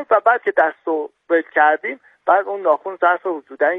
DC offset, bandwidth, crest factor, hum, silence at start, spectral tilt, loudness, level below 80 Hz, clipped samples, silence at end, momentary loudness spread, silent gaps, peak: under 0.1%; 3.9 kHz; 16 dB; none; 0 s; -6 dB/octave; -18 LUFS; -72 dBFS; under 0.1%; 0 s; 9 LU; none; -2 dBFS